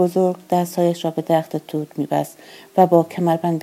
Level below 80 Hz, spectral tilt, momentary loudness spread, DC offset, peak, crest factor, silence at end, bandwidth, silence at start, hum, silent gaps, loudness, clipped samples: -74 dBFS; -7 dB/octave; 11 LU; under 0.1%; -2 dBFS; 18 dB; 0 s; 16 kHz; 0 s; none; none; -20 LUFS; under 0.1%